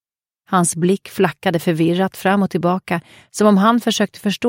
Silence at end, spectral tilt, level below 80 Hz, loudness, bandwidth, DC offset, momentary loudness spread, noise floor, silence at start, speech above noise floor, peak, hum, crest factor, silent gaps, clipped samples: 0 s; -5 dB/octave; -60 dBFS; -17 LUFS; 17 kHz; under 0.1%; 7 LU; -59 dBFS; 0.5 s; 42 dB; -2 dBFS; none; 16 dB; none; under 0.1%